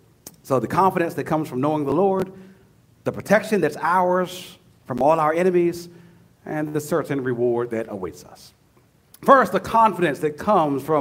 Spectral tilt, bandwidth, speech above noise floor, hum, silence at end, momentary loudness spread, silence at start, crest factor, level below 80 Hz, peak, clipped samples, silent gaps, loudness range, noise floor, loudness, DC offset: -6.5 dB/octave; 16 kHz; 37 dB; none; 0 s; 13 LU; 0.25 s; 22 dB; -58 dBFS; 0 dBFS; under 0.1%; none; 4 LU; -57 dBFS; -21 LUFS; under 0.1%